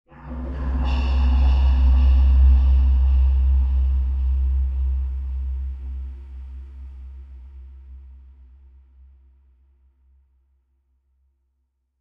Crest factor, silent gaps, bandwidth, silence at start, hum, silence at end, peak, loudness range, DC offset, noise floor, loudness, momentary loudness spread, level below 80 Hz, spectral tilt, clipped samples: 14 dB; none; 4.6 kHz; 0.2 s; none; 3.9 s; -8 dBFS; 21 LU; under 0.1%; -72 dBFS; -21 LUFS; 23 LU; -20 dBFS; -9 dB/octave; under 0.1%